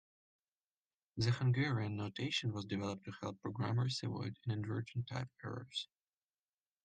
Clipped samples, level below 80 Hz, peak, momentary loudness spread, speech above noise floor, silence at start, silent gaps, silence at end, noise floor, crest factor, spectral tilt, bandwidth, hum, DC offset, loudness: under 0.1%; -72 dBFS; -24 dBFS; 10 LU; over 51 dB; 1.15 s; none; 1 s; under -90 dBFS; 16 dB; -6 dB/octave; 9.2 kHz; none; under 0.1%; -40 LUFS